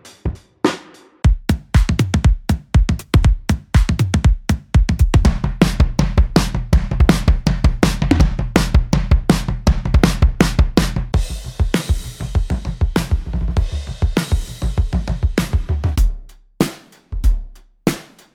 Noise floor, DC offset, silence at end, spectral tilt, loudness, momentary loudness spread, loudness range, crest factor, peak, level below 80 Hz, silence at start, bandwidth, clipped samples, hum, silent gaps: -39 dBFS; under 0.1%; 0.3 s; -6 dB/octave; -18 LUFS; 7 LU; 5 LU; 16 dB; 0 dBFS; -18 dBFS; 0.05 s; 16.5 kHz; under 0.1%; none; none